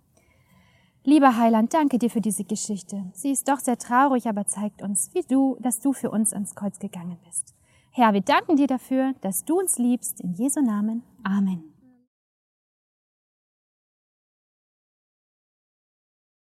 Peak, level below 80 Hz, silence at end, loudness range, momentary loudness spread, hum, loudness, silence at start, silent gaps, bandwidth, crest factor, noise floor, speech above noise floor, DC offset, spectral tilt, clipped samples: -4 dBFS; -72 dBFS; 4.75 s; 6 LU; 11 LU; none; -23 LUFS; 1.05 s; none; 15.5 kHz; 22 dB; -61 dBFS; 38 dB; under 0.1%; -4.5 dB/octave; under 0.1%